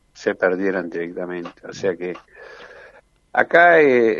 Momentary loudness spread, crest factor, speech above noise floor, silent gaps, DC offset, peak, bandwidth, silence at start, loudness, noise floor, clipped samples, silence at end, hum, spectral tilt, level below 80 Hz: 19 LU; 20 dB; 32 dB; none; under 0.1%; 0 dBFS; 7.4 kHz; 0.2 s; -18 LUFS; -50 dBFS; under 0.1%; 0 s; none; -5.5 dB/octave; -62 dBFS